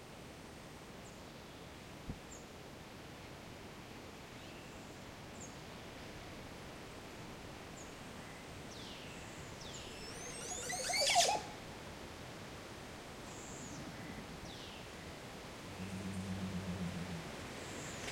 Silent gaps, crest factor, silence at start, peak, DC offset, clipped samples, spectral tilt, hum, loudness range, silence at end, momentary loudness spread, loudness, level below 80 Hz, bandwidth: none; 26 dB; 0 s; -18 dBFS; under 0.1%; under 0.1%; -3 dB/octave; none; 14 LU; 0 s; 11 LU; -44 LUFS; -62 dBFS; 16.5 kHz